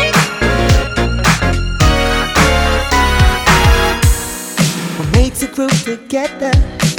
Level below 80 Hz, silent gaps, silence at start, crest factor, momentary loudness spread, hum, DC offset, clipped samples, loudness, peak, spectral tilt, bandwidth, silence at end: -18 dBFS; none; 0 s; 12 dB; 7 LU; none; under 0.1%; under 0.1%; -13 LUFS; 0 dBFS; -4.5 dB/octave; 17.5 kHz; 0 s